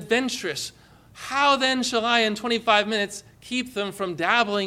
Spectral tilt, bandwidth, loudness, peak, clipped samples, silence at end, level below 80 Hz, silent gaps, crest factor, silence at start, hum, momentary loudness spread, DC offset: -2.5 dB/octave; 15.5 kHz; -23 LUFS; -6 dBFS; under 0.1%; 0 s; -62 dBFS; none; 18 dB; 0 s; none; 10 LU; under 0.1%